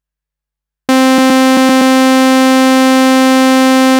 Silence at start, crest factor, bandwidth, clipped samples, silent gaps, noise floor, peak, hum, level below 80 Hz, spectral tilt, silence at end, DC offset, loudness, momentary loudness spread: 0.9 s; 8 dB; 19 kHz; under 0.1%; none; -83 dBFS; 0 dBFS; none; -60 dBFS; -2.5 dB/octave; 0 s; under 0.1%; -8 LUFS; 1 LU